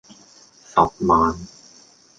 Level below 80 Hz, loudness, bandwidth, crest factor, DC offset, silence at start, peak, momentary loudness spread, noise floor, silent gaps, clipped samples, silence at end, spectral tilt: -44 dBFS; -19 LUFS; 9.2 kHz; 20 dB; under 0.1%; 0.75 s; -2 dBFS; 17 LU; -51 dBFS; none; under 0.1%; 0.75 s; -6.5 dB/octave